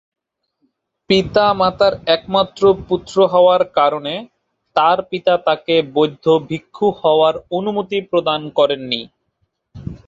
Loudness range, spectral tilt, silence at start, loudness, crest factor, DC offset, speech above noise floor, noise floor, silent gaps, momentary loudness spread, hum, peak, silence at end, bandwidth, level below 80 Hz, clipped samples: 3 LU; -6 dB/octave; 1.1 s; -16 LUFS; 16 dB; under 0.1%; 53 dB; -69 dBFS; none; 8 LU; none; -2 dBFS; 0.1 s; 7.8 kHz; -50 dBFS; under 0.1%